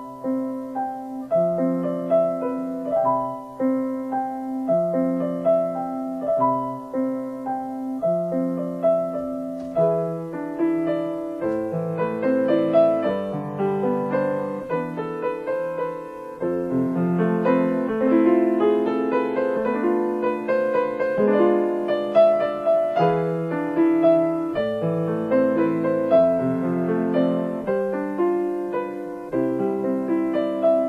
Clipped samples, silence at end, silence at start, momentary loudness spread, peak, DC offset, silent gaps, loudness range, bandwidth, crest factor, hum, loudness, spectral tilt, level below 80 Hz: under 0.1%; 0 s; 0 s; 10 LU; -6 dBFS; under 0.1%; none; 4 LU; 10 kHz; 16 dB; none; -23 LUFS; -9 dB/octave; -60 dBFS